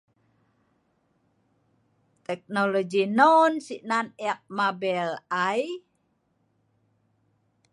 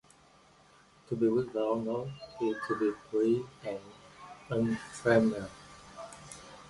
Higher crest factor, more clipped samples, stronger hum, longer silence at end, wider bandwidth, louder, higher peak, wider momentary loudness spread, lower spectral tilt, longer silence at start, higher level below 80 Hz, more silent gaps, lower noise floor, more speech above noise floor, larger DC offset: about the same, 22 dB vs 22 dB; neither; neither; first, 1.95 s vs 0 s; about the same, 11.5 kHz vs 11.5 kHz; first, -25 LUFS vs -32 LUFS; first, -6 dBFS vs -10 dBFS; second, 17 LU vs 22 LU; second, -5 dB/octave vs -6.5 dB/octave; first, 2.3 s vs 1.1 s; second, -80 dBFS vs -66 dBFS; neither; first, -71 dBFS vs -61 dBFS; first, 47 dB vs 30 dB; neither